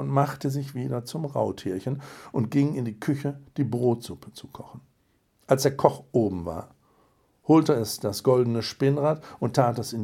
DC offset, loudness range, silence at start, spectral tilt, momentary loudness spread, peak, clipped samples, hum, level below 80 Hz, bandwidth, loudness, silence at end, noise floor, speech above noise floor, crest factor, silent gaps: under 0.1%; 5 LU; 0 s; -6.5 dB/octave; 15 LU; 0 dBFS; under 0.1%; none; -64 dBFS; 16.5 kHz; -26 LUFS; 0 s; -68 dBFS; 42 dB; 26 dB; none